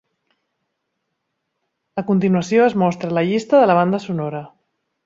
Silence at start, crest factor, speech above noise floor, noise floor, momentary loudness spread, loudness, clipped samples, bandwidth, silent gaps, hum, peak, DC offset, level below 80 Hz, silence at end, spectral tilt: 1.95 s; 16 dB; 58 dB; -75 dBFS; 14 LU; -17 LUFS; under 0.1%; 7.8 kHz; none; none; -2 dBFS; under 0.1%; -62 dBFS; 0.6 s; -7 dB/octave